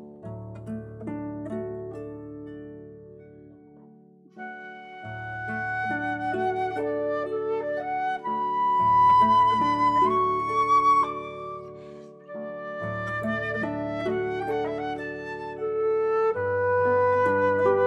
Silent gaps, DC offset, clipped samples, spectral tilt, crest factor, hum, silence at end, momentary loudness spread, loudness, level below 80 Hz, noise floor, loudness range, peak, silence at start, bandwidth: none; under 0.1%; under 0.1%; -7 dB/octave; 16 dB; none; 0 s; 20 LU; -25 LUFS; -60 dBFS; -53 dBFS; 17 LU; -10 dBFS; 0 s; 9.6 kHz